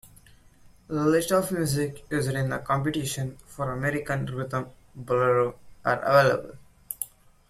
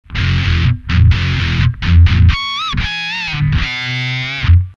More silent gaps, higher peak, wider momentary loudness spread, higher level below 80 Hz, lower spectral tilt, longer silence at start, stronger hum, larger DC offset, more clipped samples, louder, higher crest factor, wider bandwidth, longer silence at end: neither; second, -8 dBFS vs 0 dBFS; first, 13 LU vs 7 LU; second, -54 dBFS vs -20 dBFS; about the same, -5.5 dB/octave vs -6 dB/octave; about the same, 0.05 s vs 0.1 s; neither; neither; neither; second, -26 LUFS vs -14 LUFS; first, 20 dB vs 12 dB; first, 16 kHz vs 7 kHz; first, 0.45 s vs 0.05 s